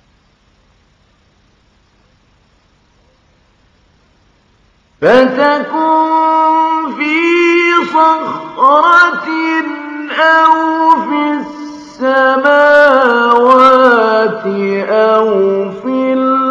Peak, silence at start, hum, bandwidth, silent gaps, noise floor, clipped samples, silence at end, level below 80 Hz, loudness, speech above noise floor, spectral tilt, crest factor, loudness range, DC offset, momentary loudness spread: 0 dBFS; 5 s; none; 9.6 kHz; none; -52 dBFS; 0.4%; 0 s; -56 dBFS; -10 LUFS; 43 dB; -5 dB/octave; 12 dB; 5 LU; under 0.1%; 10 LU